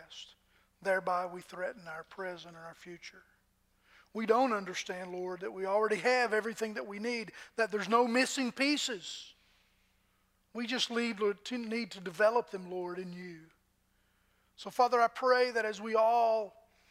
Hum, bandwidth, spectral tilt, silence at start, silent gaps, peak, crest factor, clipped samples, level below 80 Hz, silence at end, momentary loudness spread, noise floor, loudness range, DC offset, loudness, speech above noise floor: none; 15.5 kHz; -3.5 dB/octave; 0 s; none; -14 dBFS; 20 dB; under 0.1%; -78 dBFS; 0.4 s; 19 LU; -73 dBFS; 7 LU; under 0.1%; -32 LUFS; 41 dB